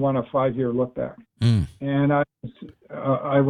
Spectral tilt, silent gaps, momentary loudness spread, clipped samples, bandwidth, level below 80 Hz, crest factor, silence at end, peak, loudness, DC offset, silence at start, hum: -8.5 dB/octave; none; 12 LU; under 0.1%; 10.5 kHz; -50 dBFS; 16 dB; 0 s; -6 dBFS; -24 LUFS; under 0.1%; 0 s; none